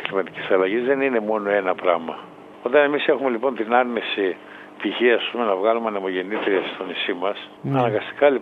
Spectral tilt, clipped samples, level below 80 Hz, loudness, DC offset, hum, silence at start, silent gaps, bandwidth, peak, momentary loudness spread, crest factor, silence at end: -7.5 dB/octave; under 0.1%; -70 dBFS; -22 LUFS; under 0.1%; none; 0 s; none; 5.2 kHz; -2 dBFS; 9 LU; 20 dB; 0 s